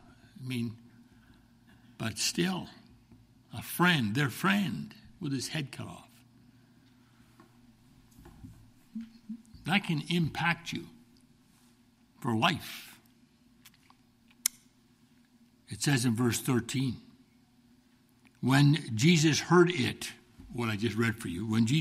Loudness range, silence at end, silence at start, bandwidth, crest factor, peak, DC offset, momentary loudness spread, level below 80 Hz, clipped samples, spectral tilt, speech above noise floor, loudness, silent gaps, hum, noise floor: 13 LU; 0 s; 0.4 s; 15.5 kHz; 24 dB; -8 dBFS; under 0.1%; 22 LU; -64 dBFS; under 0.1%; -4.5 dB/octave; 35 dB; -30 LUFS; none; none; -64 dBFS